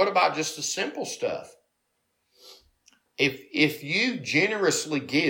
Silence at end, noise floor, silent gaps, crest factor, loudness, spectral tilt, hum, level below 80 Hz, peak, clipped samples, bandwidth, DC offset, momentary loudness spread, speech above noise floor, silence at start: 0 s; -76 dBFS; none; 20 dB; -25 LUFS; -3 dB/octave; none; -72 dBFS; -6 dBFS; under 0.1%; 17 kHz; under 0.1%; 8 LU; 50 dB; 0 s